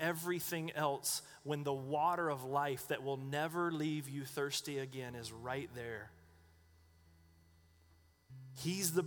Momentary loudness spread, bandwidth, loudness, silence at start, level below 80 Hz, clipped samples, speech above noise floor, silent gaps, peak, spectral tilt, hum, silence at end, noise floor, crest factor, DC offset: 11 LU; over 20 kHz; -39 LUFS; 0 s; -72 dBFS; under 0.1%; 29 dB; none; -18 dBFS; -4 dB/octave; none; 0 s; -68 dBFS; 22 dB; under 0.1%